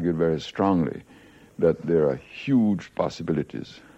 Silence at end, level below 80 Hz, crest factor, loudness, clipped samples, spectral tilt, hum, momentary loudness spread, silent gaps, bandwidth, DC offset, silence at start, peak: 0.2 s; -54 dBFS; 16 dB; -25 LUFS; under 0.1%; -8 dB/octave; none; 12 LU; none; 8.2 kHz; under 0.1%; 0 s; -8 dBFS